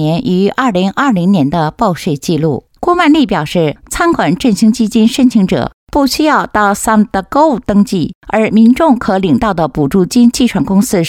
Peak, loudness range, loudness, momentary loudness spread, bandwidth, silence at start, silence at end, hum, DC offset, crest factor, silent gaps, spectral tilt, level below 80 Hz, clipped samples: 0 dBFS; 2 LU; -11 LUFS; 6 LU; 16.5 kHz; 0 s; 0 s; none; under 0.1%; 10 dB; 5.74-5.87 s, 8.15-8.21 s; -5.5 dB/octave; -36 dBFS; under 0.1%